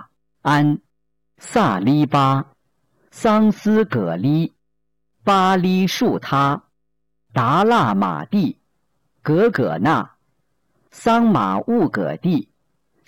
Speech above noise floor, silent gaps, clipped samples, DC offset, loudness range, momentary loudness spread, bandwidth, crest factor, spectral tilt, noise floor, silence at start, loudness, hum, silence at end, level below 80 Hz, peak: 59 dB; none; under 0.1%; under 0.1%; 2 LU; 9 LU; 17 kHz; 10 dB; -7 dB/octave; -76 dBFS; 0 s; -18 LUFS; none; 0.65 s; -56 dBFS; -10 dBFS